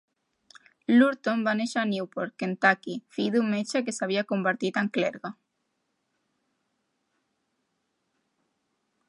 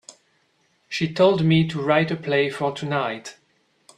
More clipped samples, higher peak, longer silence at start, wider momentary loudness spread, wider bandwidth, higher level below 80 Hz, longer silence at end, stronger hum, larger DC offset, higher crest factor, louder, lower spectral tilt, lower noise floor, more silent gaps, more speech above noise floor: neither; about the same, -6 dBFS vs -4 dBFS; first, 0.9 s vs 0.1 s; about the same, 11 LU vs 12 LU; about the same, 11 kHz vs 10.5 kHz; second, -80 dBFS vs -62 dBFS; first, 3.75 s vs 0.65 s; neither; neither; about the same, 24 dB vs 20 dB; second, -26 LUFS vs -21 LUFS; second, -5 dB/octave vs -6.5 dB/octave; first, -78 dBFS vs -65 dBFS; neither; first, 52 dB vs 45 dB